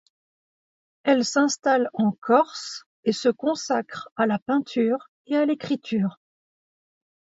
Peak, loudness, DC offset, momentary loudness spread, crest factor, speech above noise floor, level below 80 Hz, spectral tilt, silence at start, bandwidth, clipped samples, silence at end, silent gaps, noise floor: -6 dBFS; -24 LUFS; under 0.1%; 8 LU; 18 dB; over 67 dB; -74 dBFS; -4.5 dB/octave; 1.05 s; 8 kHz; under 0.1%; 1.1 s; 2.18-2.22 s, 2.86-3.03 s, 4.12-4.16 s, 4.42-4.46 s, 5.08-5.25 s; under -90 dBFS